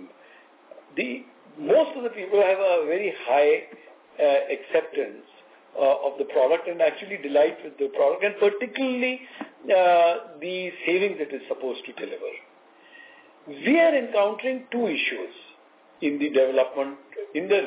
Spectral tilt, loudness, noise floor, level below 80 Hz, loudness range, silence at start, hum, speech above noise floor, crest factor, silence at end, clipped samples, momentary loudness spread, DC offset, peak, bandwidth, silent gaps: -8 dB/octave; -24 LUFS; -54 dBFS; -86 dBFS; 3 LU; 0 s; none; 31 dB; 16 dB; 0 s; under 0.1%; 15 LU; under 0.1%; -8 dBFS; 4 kHz; none